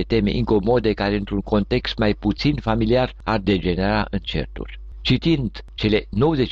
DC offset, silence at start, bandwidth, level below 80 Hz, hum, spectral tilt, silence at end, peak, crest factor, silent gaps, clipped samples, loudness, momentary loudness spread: under 0.1%; 0 s; 7.4 kHz; -32 dBFS; none; -7.5 dB/octave; 0 s; -8 dBFS; 12 dB; none; under 0.1%; -21 LUFS; 8 LU